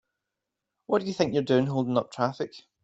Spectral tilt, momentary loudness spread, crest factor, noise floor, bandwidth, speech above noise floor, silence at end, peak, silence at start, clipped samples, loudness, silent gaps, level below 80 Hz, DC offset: -6.5 dB/octave; 7 LU; 20 dB; -86 dBFS; 8 kHz; 59 dB; 0.25 s; -8 dBFS; 0.9 s; under 0.1%; -27 LUFS; none; -68 dBFS; under 0.1%